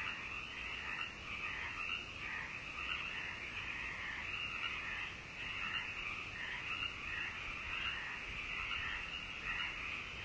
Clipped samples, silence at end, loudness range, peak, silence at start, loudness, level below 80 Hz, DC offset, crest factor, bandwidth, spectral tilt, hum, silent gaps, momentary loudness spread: under 0.1%; 0 s; 1 LU; -28 dBFS; 0 s; -41 LUFS; -58 dBFS; under 0.1%; 16 dB; 8 kHz; -2.5 dB/octave; none; none; 4 LU